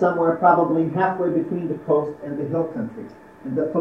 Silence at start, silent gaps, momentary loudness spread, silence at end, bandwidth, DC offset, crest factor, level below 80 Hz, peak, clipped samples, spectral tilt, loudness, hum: 0 s; none; 15 LU; 0 s; 5.8 kHz; under 0.1%; 18 dB; -64 dBFS; -2 dBFS; under 0.1%; -10 dB/octave; -22 LUFS; none